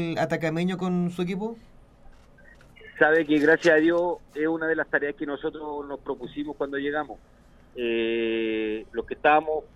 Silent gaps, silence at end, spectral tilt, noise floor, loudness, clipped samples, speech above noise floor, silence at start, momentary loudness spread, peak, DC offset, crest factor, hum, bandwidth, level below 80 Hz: none; 0.1 s; -6.5 dB/octave; -51 dBFS; -25 LUFS; under 0.1%; 26 dB; 0 s; 14 LU; -4 dBFS; under 0.1%; 22 dB; none; 11.5 kHz; -54 dBFS